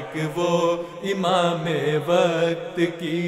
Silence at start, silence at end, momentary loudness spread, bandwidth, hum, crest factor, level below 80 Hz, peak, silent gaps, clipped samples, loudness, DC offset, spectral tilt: 0 s; 0 s; 6 LU; 14.5 kHz; none; 16 dB; -62 dBFS; -6 dBFS; none; under 0.1%; -22 LUFS; under 0.1%; -5.5 dB/octave